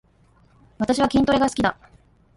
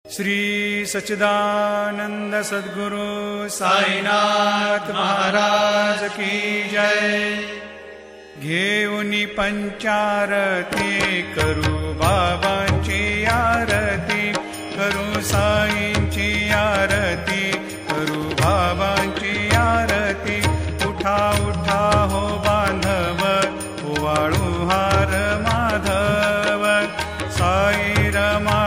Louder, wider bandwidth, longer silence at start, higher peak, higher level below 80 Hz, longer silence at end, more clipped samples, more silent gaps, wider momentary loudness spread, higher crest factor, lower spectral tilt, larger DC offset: about the same, -21 LUFS vs -19 LUFS; second, 11.5 kHz vs 16 kHz; first, 0.8 s vs 0.05 s; second, -6 dBFS vs 0 dBFS; second, -46 dBFS vs -36 dBFS; first, 0.65 s vs 0 s; neither; neither; about the same, 6 LU vs 7 LU; about the same, 16 dB vs 18 dB; about the same, -5 dB/octave vs -4.5 dB/octave; neither